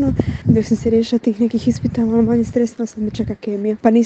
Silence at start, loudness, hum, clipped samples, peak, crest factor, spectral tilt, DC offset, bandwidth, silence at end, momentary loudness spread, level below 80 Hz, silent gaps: 0 s; -18 LUFS; none; under 0.1%; 0 dBFS; 16 dB; -8 dB/octave; under 0.1%; 8.2 kHz; 0 s; 7 LU; -40 dBFS; none